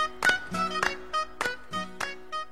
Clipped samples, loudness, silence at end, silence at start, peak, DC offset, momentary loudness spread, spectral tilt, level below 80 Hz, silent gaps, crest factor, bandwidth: under 0.1%; -29 LUFS; 0 s; 0 s; -8 dBFS; 0.7%; 10 LU; -2.5 dB/octave; -56 dBFS; none; 22 dB; 16 kHz